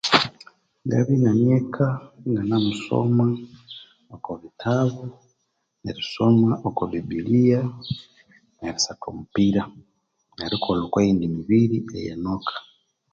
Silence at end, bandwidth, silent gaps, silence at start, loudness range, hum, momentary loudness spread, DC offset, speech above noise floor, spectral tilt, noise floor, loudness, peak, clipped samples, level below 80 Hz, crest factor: 0.5 s; 7.8 kHz; none; 0.05 s; 4 LU; none; 17 LU; under 0.1%; 52 dB; -6 dB/octave; -74 dBFS; -22 LUFS; 0 dBFS; under 0.1%; -52 dBFS; 22 dB